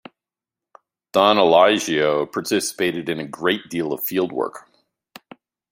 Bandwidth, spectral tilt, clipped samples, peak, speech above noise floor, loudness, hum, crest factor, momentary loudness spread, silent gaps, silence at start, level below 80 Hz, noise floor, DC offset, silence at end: 16 kHz; -3.5 dB/octave; under 0.1%; -2 dBFS; 69 dB; -20 LUFS; none; 20 dB; 12 LU; none; 1.15 s; -66 dBFS; -88 dBFS; under 0.1%; 1.1 s